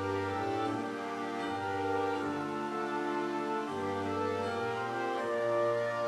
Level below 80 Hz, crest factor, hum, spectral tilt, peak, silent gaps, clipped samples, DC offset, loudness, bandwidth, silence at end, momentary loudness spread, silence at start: -74 dBFS; 14 dB; none; -6 dB/octave; -20 dBFS; none; under 0.1%; under 0.1%; -34 LUFS; 14.5 kHz; 0 s; 4 LU; 0 s